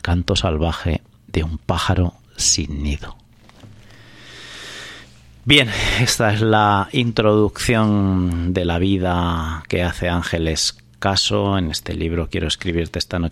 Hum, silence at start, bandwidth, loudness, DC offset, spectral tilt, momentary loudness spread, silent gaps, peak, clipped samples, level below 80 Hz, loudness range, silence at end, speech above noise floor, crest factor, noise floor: none; 0.05 s; 15.5 kHz; -19 LUFS; under 0.1%; -4.5 dB/octave; 11 LU; none; 0 dBFS; under 0.1%; -32 dBFS; 6 LU; 0 s; 26 dB; 18 dB; -44 dBFS